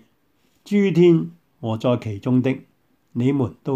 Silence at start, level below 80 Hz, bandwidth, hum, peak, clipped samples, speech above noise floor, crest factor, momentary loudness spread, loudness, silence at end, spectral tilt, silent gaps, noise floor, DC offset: 0.65 s; -62 dBFS; 8.4 kHz; none; -6 dBFS; under 0.1%; 46 dB; 16 dB; 16 LU; -20 LUFS; 0 s; -8.5 dB/octave; none; -64 dBFS; under 0.1%